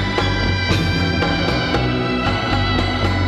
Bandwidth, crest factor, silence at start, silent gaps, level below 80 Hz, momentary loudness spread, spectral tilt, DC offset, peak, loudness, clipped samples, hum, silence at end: 11 kHz; 14 dB; 0 s; none; -28 dBFS; 1 LU; -6 dB/octave; under 0.1%; -4 dBFS; -18 LUFS; under 0.1%; none; 0 s